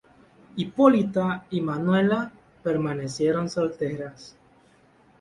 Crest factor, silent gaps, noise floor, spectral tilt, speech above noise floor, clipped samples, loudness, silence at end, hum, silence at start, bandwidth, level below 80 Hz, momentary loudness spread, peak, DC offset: 22 dB; none; -58 dBFS; -7 dB/octave; 34 dB; under 0.1%; -24 LUFS; 0.9 s; none; 0.55 s; 11.5 kHz; -60 dBFS; 14 LU; -4 dBFS; under 0.1%